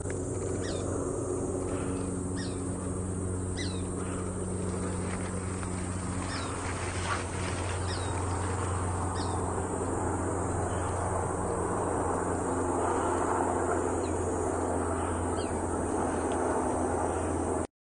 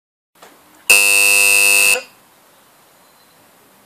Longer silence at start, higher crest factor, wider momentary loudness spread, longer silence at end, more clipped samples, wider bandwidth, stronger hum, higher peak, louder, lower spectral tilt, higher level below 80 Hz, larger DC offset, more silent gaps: second, 0 s vs 0.9 s; about the same, 16 dB vs 16 dB; second, 5 LU vs 8 LU; second, 0.2 s vs 1.8 s; neither; second, 10.5 kHz vs 16 kHz; neither; second, -16 dBFS vs 0 dBFS; second, -32 LUFS vs -9 LUFS; first, -5.5 dB/octave vs 3 dB/octave; first, -48 dBFS vs -62 dBFS; neither; neither